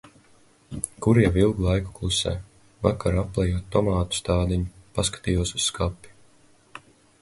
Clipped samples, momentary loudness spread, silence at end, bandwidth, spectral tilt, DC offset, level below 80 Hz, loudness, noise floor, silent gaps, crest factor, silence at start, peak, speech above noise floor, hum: under 0.1%; 13 LU; 0.45 s; 11.5 kHz; -5 dB/octave; under 0.1%; -36 dBFS; -24 LUFS; -57 dBFS; none; 22 dB; 0.7 s; -4 dBFS; 34 dB; none